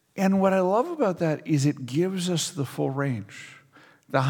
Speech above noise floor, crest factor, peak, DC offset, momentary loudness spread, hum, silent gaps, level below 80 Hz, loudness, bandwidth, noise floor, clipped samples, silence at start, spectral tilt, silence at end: 31 dB; 18 dB; -6 dBFS; under 0.1%; 10 LU; none; none; -72 dBFS; -25 LUFS; 18.5 kHz; -55 dBFS; under 0.1%; 0.15 s; -6 dB/octave; 0 s